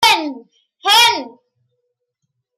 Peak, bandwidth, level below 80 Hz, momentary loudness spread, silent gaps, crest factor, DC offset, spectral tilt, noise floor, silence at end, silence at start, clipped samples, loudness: -2 dBFS; 16 kHz; -62 dBFS; 14 LU; none; 16 dB; under 0.1%; 0.5 dB/octave; -74 dBFS; 1.3 s; 0 s; under 0.1%; -13 LUFS